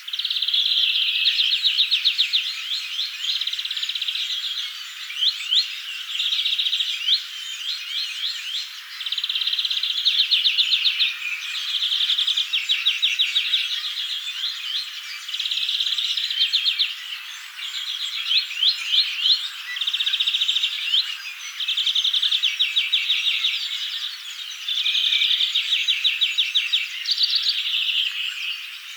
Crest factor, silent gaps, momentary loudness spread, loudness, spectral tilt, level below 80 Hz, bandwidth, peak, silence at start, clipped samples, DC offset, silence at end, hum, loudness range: 16 dB; none; 10 LU; -20 LUFS; 13 dB/octave; under -90 dBFS; over 20 kHz; -6 dBFS; 0 s; under 0.1%; under 0.1%; 0 s; none; 4 LU